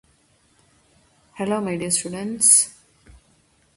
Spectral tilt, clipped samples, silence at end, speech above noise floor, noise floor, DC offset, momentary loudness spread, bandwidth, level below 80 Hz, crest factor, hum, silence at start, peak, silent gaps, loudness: -2.5 dB/octave; under 0.1%; 1.05 s; 40 dB; -61 dBFS; under 0.1%; 15 LU; 12 kHz; -60 dBFS; 24 dB; none; 1.35 s; -2 dBFS; none; -18 LUFS